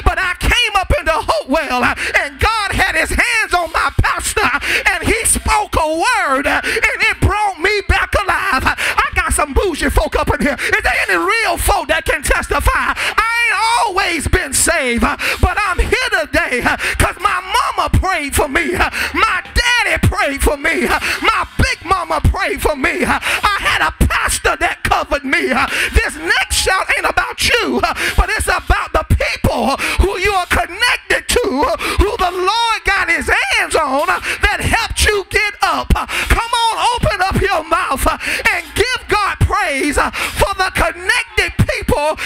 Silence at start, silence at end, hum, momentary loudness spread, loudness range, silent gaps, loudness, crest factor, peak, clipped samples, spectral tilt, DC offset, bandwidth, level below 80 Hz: 0 s; 0 s; none; 3 LU; 1 LU; none; -14 LUFS; 14 dB; -2 dBFS; under 0.1%; -3.5 dB/octave; under 0.1%; 16.5 kHz; -24 dBFS